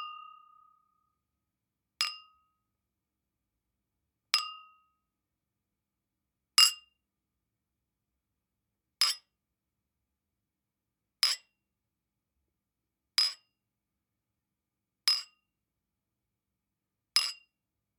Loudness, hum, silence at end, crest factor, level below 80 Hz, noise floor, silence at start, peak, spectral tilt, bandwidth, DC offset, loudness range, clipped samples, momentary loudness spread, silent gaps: -28 LUFS; none; 0.65 s; 32 dB; under -90 dBFS; -88 dBFS; 0 s; -6 dBFS; 5.5 dB/octave; 19 kHz; under 0.1%; 9 LU; under 0.1%; 23 LU; none